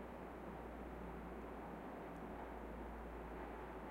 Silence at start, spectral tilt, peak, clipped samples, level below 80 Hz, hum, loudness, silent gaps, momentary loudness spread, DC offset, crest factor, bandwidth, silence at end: 0 s; -7.5 dB/octave; -38 dBFS; under 0.1%; -58 dBFS; none; -51 LUFS; none; 1 LU; under 0.1%; 12 dB; 16 kHz; 0 s